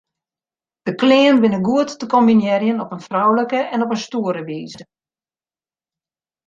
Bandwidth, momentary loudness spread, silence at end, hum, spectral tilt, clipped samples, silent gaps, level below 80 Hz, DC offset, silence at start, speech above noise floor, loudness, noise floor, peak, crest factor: 7.6 kHz; 14 LU; 1.65 s; none; -6 dB/octave; under 0.1%; none; -64 dBFS; under 0.1%; 0.85 s; over 74 dB; -17 LUFS; under -90 dBFS; -2 dBFS; 16 dB